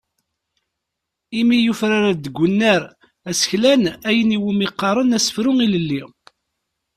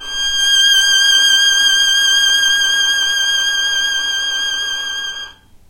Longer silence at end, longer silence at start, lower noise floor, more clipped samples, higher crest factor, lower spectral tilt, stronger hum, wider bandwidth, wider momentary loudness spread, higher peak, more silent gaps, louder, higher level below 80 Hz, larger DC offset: first, 0.9 s vs 0.4 s; first, 1.3 s vs 0 s; first, -80 dBFS vs -34 dBFS; neither; about the same, 16 dB vs 12 dB; first, -4.5 dB/octave vs 4 dB/octave; neither; second, 14.5 kHz vs 16 kHz; about the same, 9 LU vs 10 LU; about the same, -2 dBFS vs -2 dBFS; neither; second, -18 LUFS vs -11 LUFS; second, -56 dBFS vs -46 dBFS; neither